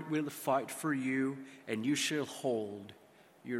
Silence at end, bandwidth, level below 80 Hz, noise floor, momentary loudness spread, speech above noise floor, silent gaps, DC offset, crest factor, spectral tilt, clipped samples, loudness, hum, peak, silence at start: 0 s; 16.5 kHz; -82 dBFS; -58 dBFS; 14 LU; 22 dB; none; under 0.1%; 18 dB; -4 dB/octave; under 0.1%; -35 LUFS; none; -18 dBFS; 0 s